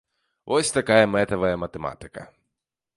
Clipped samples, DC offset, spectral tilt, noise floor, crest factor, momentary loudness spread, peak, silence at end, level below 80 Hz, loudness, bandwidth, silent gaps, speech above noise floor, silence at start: under 0.1%; under 0.1%; -4 dB/octave; -84 dBFS; 24 dB; 22 LU; -2 dBFS; 0.7 s; -52 dBFS; -22 LUFS; 11.5 kHz; none; 61 dB; 0.45 s